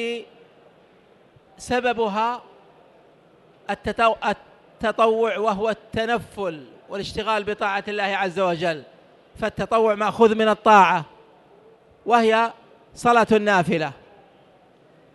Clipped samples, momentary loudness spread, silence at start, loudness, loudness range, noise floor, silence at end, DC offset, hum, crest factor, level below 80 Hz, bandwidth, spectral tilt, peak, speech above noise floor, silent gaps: under 0.1%; 14 LU; 0 s; -21 LUFS; 6 LU; -54 dBFS; 1.2 s; under 0.1%; none; 20 dB; -54 dBFS; 12 kHz; -5 dB/octave; -4 dBFS; 34 dB; none